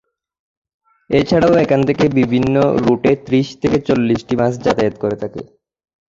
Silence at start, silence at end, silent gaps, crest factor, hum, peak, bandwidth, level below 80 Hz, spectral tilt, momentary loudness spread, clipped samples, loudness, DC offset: 1.1 s; 0.7 s; none; 14 dB; none; -2 dBFS; 7.6 kHz; -44 dBFS; -7.5 dB/octave; 7 LU; under 0.1%; -15 LUFS; under 0.1%